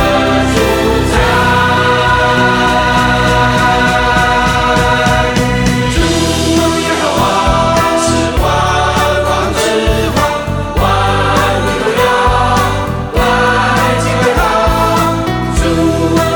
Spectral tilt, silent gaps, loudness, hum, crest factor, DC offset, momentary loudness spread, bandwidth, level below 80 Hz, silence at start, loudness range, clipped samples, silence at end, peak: -4.5 dB/octave; none; -11 LUFS; none; 10 dB; under 0.1%; 3 LU; 19.5 kHz; -22 dBFS; 0 s; 2 LU; under 0.1%; 0 s; 0 dBFS